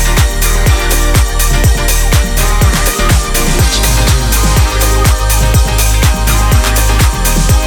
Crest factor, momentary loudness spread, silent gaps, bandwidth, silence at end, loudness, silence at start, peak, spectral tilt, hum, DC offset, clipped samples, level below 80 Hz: 8 dB; 2 LU; none; over 20 kHz; 0 s; -11 LUFS; 0 s; 0 dBFS; -3.5 dB/octave; none; under 0.1%; under 0.1%; -10 dBFS